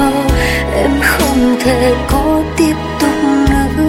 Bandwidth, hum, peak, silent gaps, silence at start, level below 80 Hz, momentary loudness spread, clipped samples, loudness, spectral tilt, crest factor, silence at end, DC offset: 16.5 kHz; none; 0 dBFS; none; 0 s; -22 dBFS; 3 LU; under 0.1%; -12 LUFS; -5.5 dB/octave; 12 dB; 0 s; under 0.1%